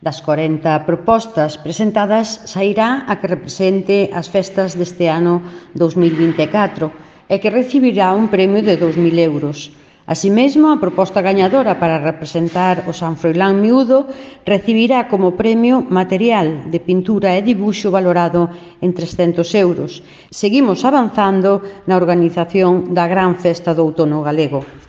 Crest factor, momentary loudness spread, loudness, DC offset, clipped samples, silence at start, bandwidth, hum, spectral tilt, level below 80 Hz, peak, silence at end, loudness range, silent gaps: 14 dB; 7 LU; -14 LUFS; under 0.1%; under 0.1%; 0 s; 8 kHz; none; -6.5 dB/octave; -52 dBFS; 0 dBFS; 0.1 s; 2 LU; none